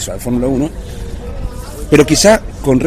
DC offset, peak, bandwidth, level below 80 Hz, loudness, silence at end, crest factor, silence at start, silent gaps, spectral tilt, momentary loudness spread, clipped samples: under 0.1%; 0 dBFS; 16.5 kHz; -26 dBFS; -12 LUFS; 0 s; 14 dB; 0 s; none; -4.5 dB/octave; 18 LU; 0.9%